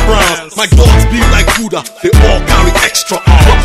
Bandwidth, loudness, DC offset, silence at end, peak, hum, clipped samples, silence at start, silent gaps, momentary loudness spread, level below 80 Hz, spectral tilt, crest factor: 15.5 kHz; -9 LUFS; 0.5%; 0 s; 0 dBFS; none; 3%; 0 s; none; 6 LU; -10 dBFS; -4.5 dB/octave; 8 dB